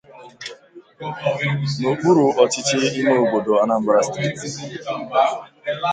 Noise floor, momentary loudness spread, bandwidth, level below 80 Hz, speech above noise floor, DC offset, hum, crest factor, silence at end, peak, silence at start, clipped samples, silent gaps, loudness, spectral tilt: -43 dBFS; 15 LU; 9.4 kHz; -60 dBFS; 24 dB; under 0.1%; none; 18 dB; 0 s; 0 dBFS; 0.1 s; under 0.1%; none; -19 LUFS; -5 dB/octave